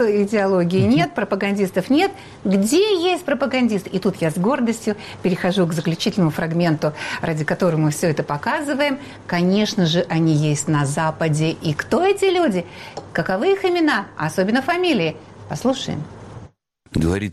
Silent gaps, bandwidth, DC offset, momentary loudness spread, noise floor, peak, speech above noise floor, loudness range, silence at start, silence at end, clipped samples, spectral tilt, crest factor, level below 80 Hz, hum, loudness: none; 14.5 kHz; under 0.1%; 8 LU; -46 dBFS; -6 dBFS; 27 dB; 2 LU; 0 s; 0 s; under 0.1%; -5.5 dB/octave; 12 dB; -48 dBFS; none; -20 LUFS